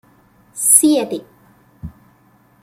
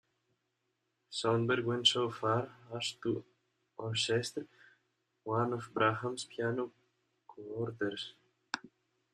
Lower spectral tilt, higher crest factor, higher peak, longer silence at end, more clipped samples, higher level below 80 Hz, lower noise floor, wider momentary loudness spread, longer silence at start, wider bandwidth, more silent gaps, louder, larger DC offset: second, -2.5 dB/octave vs -4.5 dB/octave; about the same, 20 dB vs 24 dB; first, 0 dBFS vs -14 dBFS; first, 0.75 s vs 0.45 s; neither; first, -52 dBFS vs -76 dBFS; second, -53 dBFS vs -83 dBFS; first, 27 LU vs 16 LU; second, 0.55 s vs 1.1 s; first, 16.5 kHz vs 13 kHz; neither; first, -13 LUFS vs -35 LUFS; neither